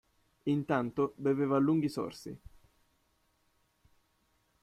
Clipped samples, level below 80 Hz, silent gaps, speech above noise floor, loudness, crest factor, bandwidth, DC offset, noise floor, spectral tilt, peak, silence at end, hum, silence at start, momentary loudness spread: under 0.1%; -66 dBFS; none; 43 dB; -32 LUFS; 18 dB; 13 kHz; under 0.1%; -74 dBFS; -7.5 dB/octave; -16 dBFS; 2.25 s; none; 0.45 s; 17 LU